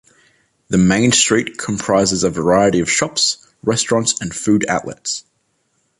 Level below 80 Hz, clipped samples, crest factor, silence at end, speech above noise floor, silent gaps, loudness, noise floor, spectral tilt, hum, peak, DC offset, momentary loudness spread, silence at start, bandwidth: -46 dBFS; under 0.1%; 18 dB; 0.8 s; 49 dB; none; -16 LUFS; -65 dBFS; -3.5 dB/octave; none; 0 dBFS; under 0.1%; 10 LU; 0.7 s; 11.5 kHz